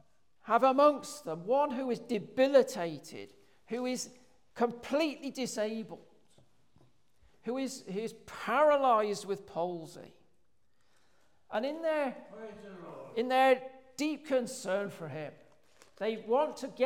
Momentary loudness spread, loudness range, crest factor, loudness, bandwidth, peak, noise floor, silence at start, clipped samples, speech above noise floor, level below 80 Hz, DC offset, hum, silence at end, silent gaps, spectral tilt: 21 LU; 8 LU; 20 dB; -32 LUFS; 16.5 kHz; -14 dBFS; -77 dBFS; 0.45 s; under 0.1%; 45 dB; -78 dBFS; under 0.1%; none; 0 s; none; -4.5 dB/octave